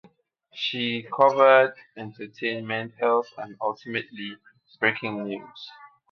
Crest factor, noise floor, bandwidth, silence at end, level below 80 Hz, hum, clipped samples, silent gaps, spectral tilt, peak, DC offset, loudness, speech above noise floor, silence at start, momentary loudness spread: 22 dB; -61 dBFS; 6.4 kHz; 0.25 s; -76 dBFS; none; under 0.1%; none; -5.5 dB/octave; -4 dBFS; under 0.1%; -24 LUFS; 36 dB; 0.55 s; 22 LU